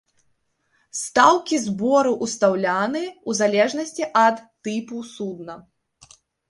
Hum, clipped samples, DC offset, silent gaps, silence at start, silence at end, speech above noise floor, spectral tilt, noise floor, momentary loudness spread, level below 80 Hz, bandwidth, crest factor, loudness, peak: none; under 0.1%; under 0.1%; none; 0.95 s; 0.9 s; 47 dB; -3.5 dB/octave; -68 dBFS; 15 LU; -66 dBFS; 11.5 kHz; 22 dB; -21 LUFS; -2 dBFS